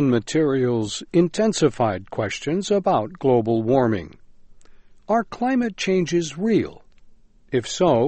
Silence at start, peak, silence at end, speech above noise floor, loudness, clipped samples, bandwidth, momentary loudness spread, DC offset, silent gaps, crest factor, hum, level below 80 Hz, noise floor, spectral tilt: 0 s; -6 dBFS; 0 s; 28 dB; -22 LUFS; under 0.1%; 8.8 kHz; 7 LU; under 0.1%; none; 16 dB; none; -52 dBFS; -49 dBFS; -6 dB/octave